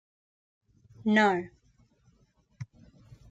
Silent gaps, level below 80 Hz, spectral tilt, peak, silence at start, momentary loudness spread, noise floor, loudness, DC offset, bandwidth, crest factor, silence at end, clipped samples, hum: none; -68 dBFS; -6 dB/octave; -12 dBFS; 1.05 s; 23 LU; -67 dBFS; -26 LUFS; under 0.1%; 7.8 kHz; 22 dB; 0.65 s; under 0.1%; none